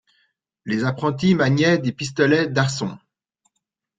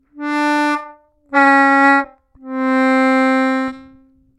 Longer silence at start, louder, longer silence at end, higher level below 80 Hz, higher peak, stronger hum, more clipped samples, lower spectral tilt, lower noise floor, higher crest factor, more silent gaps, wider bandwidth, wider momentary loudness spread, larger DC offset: first, 0.65 s vs 0.15 s; second, -20 LUFS vs -14 LUFS; first, 1 s vs 0.55 s; about the same, -58 dBFS vs -60 dBFS; second, -4 dBFS vs 0 dBFS; neither; neither; first, -6 dB/octave vs -3.5 dB/octave; first, -78 dBFS vs -49 dBFS; about the same, 18 dB vs 16 dB; neither; second, 9.4 kHz vs 11.5 kHz; second, 10 LU vs 13 LU; neither